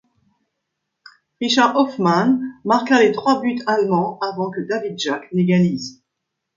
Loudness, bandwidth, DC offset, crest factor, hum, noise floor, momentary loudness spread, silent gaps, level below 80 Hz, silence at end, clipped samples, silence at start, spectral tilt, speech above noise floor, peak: -18 LUFS; 7.6 kHz; under 0.1%; 18 dB; none; -79 dBFS; 9 LU; none; -64 dBFS; 0.65 s; under 0.1%; 1.4 s; -5.5 dB/octave; 61 dB; -2 dBFS